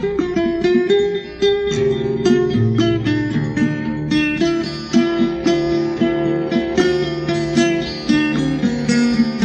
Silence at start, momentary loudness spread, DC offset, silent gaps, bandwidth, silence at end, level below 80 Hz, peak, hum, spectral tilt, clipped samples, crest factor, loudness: 0 s; 4 LU; under 0.1%; none; 9.4 kHz; 0 s; -42 dBFS; -4 dBFS; none; -6 dB/octave; under 0.1%; 14 dB; -17 LUFS